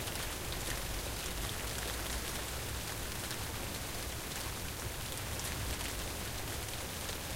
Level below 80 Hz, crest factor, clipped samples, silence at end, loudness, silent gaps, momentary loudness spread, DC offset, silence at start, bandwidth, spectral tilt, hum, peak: -46 dBFS; 18 dB; under 0.1%; 0 s; -39 LUFS; none; 2 LU; under 0.1%; 0 s; 17 kHz; -2.5 dB/octave; none; -22 dBFS